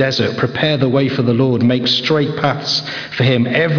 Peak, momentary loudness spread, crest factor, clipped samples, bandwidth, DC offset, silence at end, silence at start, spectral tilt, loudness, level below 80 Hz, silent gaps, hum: -2 dBFS; 4 LU; 12 dB; under 0.1%; 5.4 kHz; under 0.1%; 0 s; 0 s; -6 dB/octave; -15 LUFS; -52 dBFS; none; none